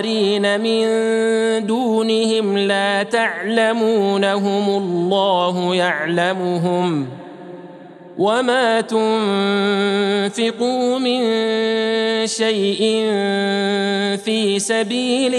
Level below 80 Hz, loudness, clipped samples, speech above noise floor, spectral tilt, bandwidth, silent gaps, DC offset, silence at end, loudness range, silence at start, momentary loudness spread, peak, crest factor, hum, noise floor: -76 dBFS; -18 LUFS; under 0.1%; 21 dB; -4.5 dB/octave; 12 kHz; none; under 0.1%; 0 s; 2 LU; 0 s; 3 LU; -2 dBFS; 16 dB; none; -38 dBFS